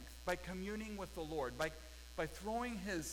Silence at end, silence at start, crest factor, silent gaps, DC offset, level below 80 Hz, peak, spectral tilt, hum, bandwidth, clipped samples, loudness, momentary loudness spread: 0 s; 0 s; 18 dB; none; under 0.1%; -56 dBFS; -26 dBFS; -4.5 dB/octave; none; 19 kHz; under 0.1%; -44 LUFS; 5 LU